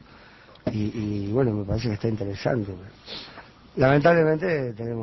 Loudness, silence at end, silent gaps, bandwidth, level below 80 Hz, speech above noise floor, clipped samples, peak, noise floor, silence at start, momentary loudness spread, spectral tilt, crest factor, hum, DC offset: -24 LUFS; 0 s; none; 6 kHz; -46 dBFS; 26 dB; under 0.1%; -6 dBFS; -50 dBFS; 0.15 s; 18 LU; -8 dB/octave; 18 dB; none; under 0.1%